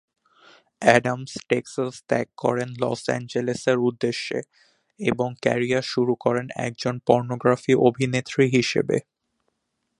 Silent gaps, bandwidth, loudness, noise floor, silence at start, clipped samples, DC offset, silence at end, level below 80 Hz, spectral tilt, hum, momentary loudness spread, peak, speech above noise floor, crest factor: none; 11.5 kHz; -23 LUFS; -77 dBFS; 0.8 s; under 0.1%; under 0.1%; 1 s; -62 dBFS; -5.5 dB/octave; none; 9 LU; 0 dBFS; 54 dB; 24 dB